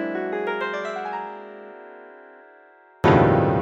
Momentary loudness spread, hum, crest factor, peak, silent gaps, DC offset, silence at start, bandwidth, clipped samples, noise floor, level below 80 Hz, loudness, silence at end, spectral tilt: 25 LU; none; 20 dB; -4 dBFS; none; under 0.1%; 0 s; 7.6 kHz; under 0.1%; -51 dBFS; -48 dBFS; -22 LUFS; 0 s; -8 dB/octave